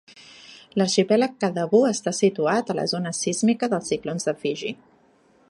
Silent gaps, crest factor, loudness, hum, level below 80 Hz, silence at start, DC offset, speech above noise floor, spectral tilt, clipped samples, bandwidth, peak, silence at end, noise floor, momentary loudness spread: none; 18 dB; -23 LUFS; none; -68 dBFS; 0.15 s; under 0.1%; 36 dB; -4.5 dB/octave; under 0.1%; 11.5 kHz; -6 dBFS; 0.75 s; -59 dBFS; 10 LU